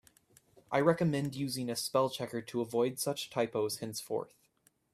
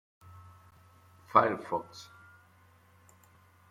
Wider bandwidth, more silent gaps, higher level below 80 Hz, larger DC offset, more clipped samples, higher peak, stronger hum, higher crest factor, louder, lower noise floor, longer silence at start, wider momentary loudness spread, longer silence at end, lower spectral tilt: about the same, 15.5 kHz vs 16 kHz; neither; first, -72 dBFS vs -78 dBFS; neither; neither; second, -12 dBFS vs -8 dBFS; neither; second, 22 dB vs 28 dB; second, -34 LUFS vs -29 LUFS; first, -72 dBFS vs -62 dBFS; second, 0.7 s vs 1.35 s; second, 9 LU vs 28 LU; second, 0.65 s vs 1.65 s; about the same, -5 dB/octave vs -6 dB/octave